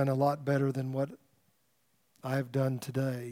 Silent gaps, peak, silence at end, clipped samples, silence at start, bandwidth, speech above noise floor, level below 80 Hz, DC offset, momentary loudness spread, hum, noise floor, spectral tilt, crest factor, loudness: none; -16 dBFS; 0 s; under 0.1%; 0 s; 16 kHz; 43 dB; -82 dBFS; under 0.1%; 7 LU; none; -74 dBFS; -7.5 dB/octave; 16 dB; -32 LUFS